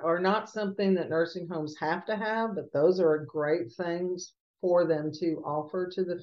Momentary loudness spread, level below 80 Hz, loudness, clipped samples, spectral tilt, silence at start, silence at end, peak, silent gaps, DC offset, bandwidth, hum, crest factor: 8 LU; -76 dBFS; -29 LUFS; under 0.1%; -6.5 dB/octave; 0 s; 0 s; -12 dBFS; 4.40-4.54 s; under 0.1%; 7.4 kHz; none; 16 dB